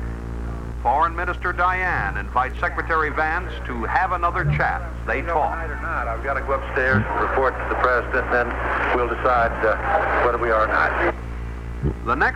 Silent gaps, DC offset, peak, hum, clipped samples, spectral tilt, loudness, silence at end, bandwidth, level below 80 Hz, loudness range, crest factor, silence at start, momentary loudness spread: none; under 0.1%; -6 dBFS; none; under 0.1%; -7 dB/octave; -22 LUFS; 0 s; 9.6 kHz; -30 dBFS; 3 LU; 16 dB; 0 s; 9 LU